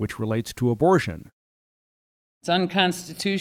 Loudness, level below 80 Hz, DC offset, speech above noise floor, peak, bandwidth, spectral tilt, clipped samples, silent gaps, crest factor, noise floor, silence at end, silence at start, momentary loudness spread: -23 LUFS; -54 dBFS; under 0.1%; over 67 dB; -6 dBFS; 16 kHz; -5.5 dB/octave; under 0.1%; 1.32-2.41 s; 18 dB; under -90 dBFS; 0 s; 0 s; 12 LU